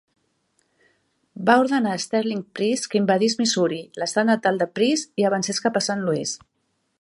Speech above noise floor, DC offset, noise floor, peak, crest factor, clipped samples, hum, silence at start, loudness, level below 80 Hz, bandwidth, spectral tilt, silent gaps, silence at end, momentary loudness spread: 50 dB; under 0.1%; -72 dBFS; -2 dBFS; 20 dB; under 0.1%; none; 1.35 s; -22 LUFS; -70 dBFS; 11.5 kHz; -4 dB/octave; none; 0.65 s; 7 LU